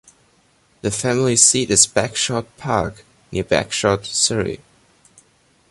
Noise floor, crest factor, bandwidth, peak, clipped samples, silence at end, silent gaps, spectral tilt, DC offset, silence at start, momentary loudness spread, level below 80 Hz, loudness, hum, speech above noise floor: -58 dBFS; 20 dB; 12 kHz; 0 dBFS; under 0.1%; 1.15 s; none; -2.5 dB/octave; under 0.1%; 0.85 s; 15 LU; -46 dBFS; -17 LUFS; none; 39 dB